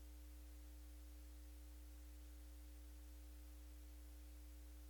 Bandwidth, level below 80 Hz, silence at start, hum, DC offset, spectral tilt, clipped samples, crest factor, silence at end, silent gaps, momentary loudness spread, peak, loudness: 19 kHz; -58 dBFS; 0 s; 60 Hz at -60 dBFS; under 0.1%; -5 dB/octave; under 0.1%; 6 dB; 0 s; none; 0 LU; -50 dBFS; -60 LUFS